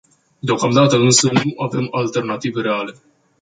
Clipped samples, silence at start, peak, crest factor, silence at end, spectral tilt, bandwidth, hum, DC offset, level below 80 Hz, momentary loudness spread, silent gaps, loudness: under 0.1%; 0.45 s; 0 dBFS; 16 dB; 0.5 s; -4.5 dB/octave; 9.6 kHz; none; under 0.1%; -58 dBFS; 11 LU; none; -17 LUFS